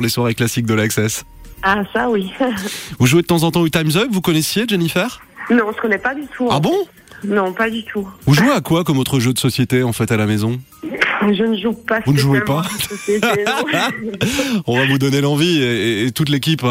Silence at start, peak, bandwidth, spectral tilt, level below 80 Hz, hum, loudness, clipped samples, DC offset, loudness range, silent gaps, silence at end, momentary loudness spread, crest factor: 0 s; -2 dBFS; 16.5 kHz; -5 dB/octave; -46 dBFS; none; -17 LUFS; under 0.1%; under 0.1%; 2 LU; none; 0 s; 7 LU; 14 dB